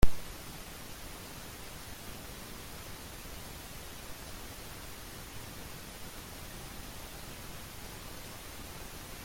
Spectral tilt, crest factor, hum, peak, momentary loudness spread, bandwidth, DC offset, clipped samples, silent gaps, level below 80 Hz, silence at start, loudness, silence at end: -3.5 dB/octave; 26 dB; none; -8 dBFS; 0 LU; 16.5 kHz; under 0.1%; under 0.1%; none; -44 dBFS; 0 s; -45 LUFS; 0 s